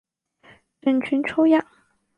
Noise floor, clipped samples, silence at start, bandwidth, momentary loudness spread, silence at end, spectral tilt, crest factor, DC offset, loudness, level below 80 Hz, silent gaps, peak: -55 dBFS; under 0.1%; 0.85 s; 9.2 kHz; 5 LU; 0.55 s; -6.5 dB/octave; 18 dB; under 0.1%; -21 LUFS; -66 dBFS; none; -6 dBFS